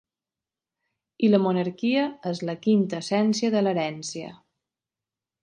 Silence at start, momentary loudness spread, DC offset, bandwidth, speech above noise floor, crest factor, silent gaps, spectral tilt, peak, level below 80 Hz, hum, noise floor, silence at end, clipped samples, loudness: 1.2 s; 11 LU; under 0.1%; 9.6 kHz; over 66 dB; 20 dB; none; -6 dB/octave; -6 dBFS; -72 dBFS; none; under -90 dBFS; 1.05 s; under 0.1%; -24 LUFS